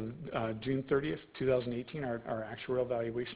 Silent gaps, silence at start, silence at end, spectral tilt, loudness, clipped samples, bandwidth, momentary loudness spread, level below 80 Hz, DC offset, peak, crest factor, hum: none; 0 s; 0 s; -5.5 dB/octave; -35 LUFS; under 0.1%; 4 kHz; 7 LU; -62 dBFS; under 0.1%; -18 dBFS; 16 dB; none